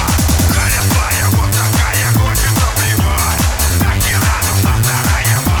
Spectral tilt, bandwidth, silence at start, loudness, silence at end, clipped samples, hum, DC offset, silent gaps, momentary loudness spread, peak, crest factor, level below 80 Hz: -4 dB/octave; 19.5 kHz; 0 s; -13 LUFS; 0 s; under 0.1%; none; 0.4%; none; 1 LU; 0 dBFS; 12 dB; -20 dBFS